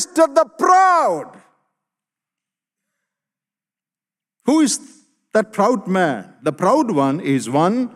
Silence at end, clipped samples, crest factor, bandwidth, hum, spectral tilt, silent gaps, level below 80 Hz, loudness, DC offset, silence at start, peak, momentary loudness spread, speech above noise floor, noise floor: 0.1 s; under 0.1%; 16 dB; 14 kHz; none; -5 dB/octave; none; -70 dBFS; -17 LUFS; under 0.1%; 0 s; -2 dBFS; 10 LU; over 73 dB; under -90 dBFS